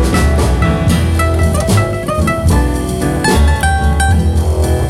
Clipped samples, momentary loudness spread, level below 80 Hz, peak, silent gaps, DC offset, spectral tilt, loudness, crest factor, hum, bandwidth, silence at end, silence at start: under 0.1%; 3 LU; -16 dBFS; -2 dBFS; none; under 0.1%; -6 dB/octave; -13 LUFS; 10 dB; none; 15 kHz; 0 s; 0 s